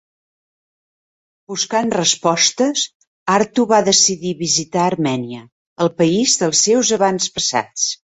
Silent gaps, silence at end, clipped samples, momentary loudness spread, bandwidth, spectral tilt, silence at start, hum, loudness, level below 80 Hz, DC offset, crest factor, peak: 2.95-3.00 s, 3.07-3.26 s, 5.52-5.76 s; 0.2 s; under 0.1%; 10 LU; 8.4 kHz; -2.5 dB/octave; 1.5 s; none; -16 LUFS; -58 dBFS; under 0.1%; 18 dB; 0 dBFS